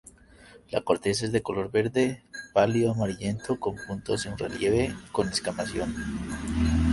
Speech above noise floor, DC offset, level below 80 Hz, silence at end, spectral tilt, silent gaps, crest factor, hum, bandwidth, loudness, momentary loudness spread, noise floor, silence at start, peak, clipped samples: 26 dB; under 0.1%; -40 dBFS; 0 s; -5.5 dB/octave; none; 20 dB; none; 11.5 kHz; -28 LUFS; 8 LU; -53 dBFS; 0.4 s; -6 dBFS; under 0.1%